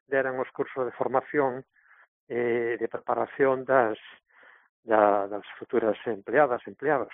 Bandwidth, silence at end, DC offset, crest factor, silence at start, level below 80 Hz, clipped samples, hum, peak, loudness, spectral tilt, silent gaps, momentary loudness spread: 3.9 kHz; 0 s; under 0.1%; 22 dB; 0.1 s; -72 dBFS; under 0.1%; none; -6 dBFS; -27 LUFS; -0.5 dB/octave; 2.08-2.27 s, 4.69-4.83 s; 10 LU